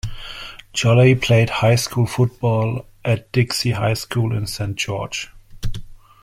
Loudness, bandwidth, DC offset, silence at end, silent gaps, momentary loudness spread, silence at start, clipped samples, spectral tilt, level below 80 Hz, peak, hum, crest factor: -19 LUFS; 15.5 kHz; under 0.1%; 0.25 s; none; 18 LU; 0.05 s; under 0.1%; -5.5 dB/octave; -38 dBFS; -2 dBFS; none; 16 dB